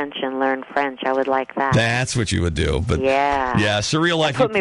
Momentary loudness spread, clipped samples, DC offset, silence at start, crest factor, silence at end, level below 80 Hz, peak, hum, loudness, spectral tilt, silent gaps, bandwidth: 4 LU; under 0.1%; under 0.1%; 0 s; 14 dB; 0 s; -34 dBFS; -6 dBFS; none; -20 LUFS; -5 dB/octave; none; 11.5 kHz